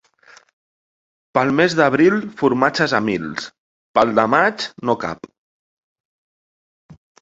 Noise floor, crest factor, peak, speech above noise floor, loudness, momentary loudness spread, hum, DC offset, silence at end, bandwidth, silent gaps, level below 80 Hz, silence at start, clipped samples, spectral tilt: -50 dBFS; 20 dB; 0 dBFS; 33 dB; -18 LUFS; 13 LU; none; under 0.1%; 0.3 s; 8 kHz; 3.58-3.94 s, 5.38-6.89 s; -58 dBFS; 1.35 s; under 0.1%; -5.5 dB/octave